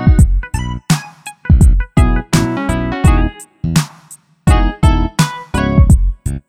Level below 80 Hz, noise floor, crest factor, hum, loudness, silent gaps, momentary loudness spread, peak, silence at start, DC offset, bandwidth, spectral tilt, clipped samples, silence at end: -16 dBFS; -41 dBFS; 12 dB; none; -14 LUFS; none; 11 LU; 0 dBFS; 0 s; under 0.1%; 15.5 kHz; -6 dB/octave; under 0.1%; 0.1 s